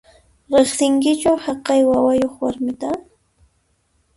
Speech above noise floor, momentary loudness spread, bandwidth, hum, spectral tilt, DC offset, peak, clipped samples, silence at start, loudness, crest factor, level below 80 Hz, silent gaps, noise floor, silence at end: 47 dB; 10 LU; 11.5 kHz; none; -4 dB/octave; under 0.1%; -2 dBFS; under 0.1%; 0.5 s; -18 LUFS; 16 dB; -52 dBFS; none; -64 dBFS; 1.15 s